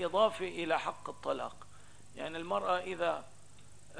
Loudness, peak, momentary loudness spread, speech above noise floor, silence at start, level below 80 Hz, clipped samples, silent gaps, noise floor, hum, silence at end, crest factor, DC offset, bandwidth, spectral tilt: -35 LUFS; -16 dBFS; 14 LU; 24 dB; 0 s; -68 dBFS; under 0.1%; none; -59 dBFS; 50 Hz at -65 dBFS; 0 s; 20 dB; 0.3%; 11 kHz; -4 dB/octave